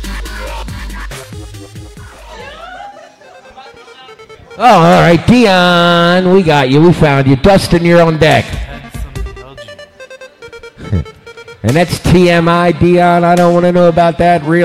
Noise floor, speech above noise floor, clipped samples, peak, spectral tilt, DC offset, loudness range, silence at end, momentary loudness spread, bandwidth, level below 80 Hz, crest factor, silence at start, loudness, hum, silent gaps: -37 dBFS; 30 dB; under 0.1%; 0 dBFS; -6.5 dB/octave; under 0.1%; 19 LU; 0 s; 22 LU; 14.5 kHz; -30 dBFS; 10 dB; 0 s; -8 LUFS; none; none